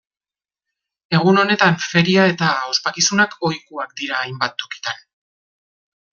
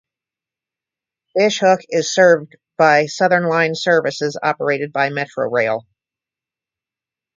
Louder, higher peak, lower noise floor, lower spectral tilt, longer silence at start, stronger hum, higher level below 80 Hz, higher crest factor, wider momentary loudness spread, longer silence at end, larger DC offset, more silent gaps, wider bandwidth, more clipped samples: about the same, -17 LUFS vs -17 LUFS; about the same, -2 dBFS vs 0 dBFS; about the same, under -90 dBFS vs -88 dBFS; about the same, -4 dB/octave vs -4 dB/octave; second, 1.1 s vs 1.35 s; neither; first, -60 dBFS vs -68 dBFS; about the same, 18 dB vs 18 dB; first, 13 LU vs 8 LU; second, 1.15 s vs 1.6 s; neither; neither; about the same, 7.4 kHz vs 7.6 kHz; neither